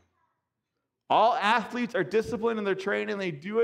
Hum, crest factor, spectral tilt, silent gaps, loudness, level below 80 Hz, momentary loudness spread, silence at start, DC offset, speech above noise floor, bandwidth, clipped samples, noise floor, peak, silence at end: none; 18 dB; -5 dB/octave; none; -27 LUFS; -66 dBFS; 8 LU; 1.1 s; under 0.1%; 57 dB; 12.5 kHz; under 0.1%; -83 dBFS; -10 dBFS; 0 s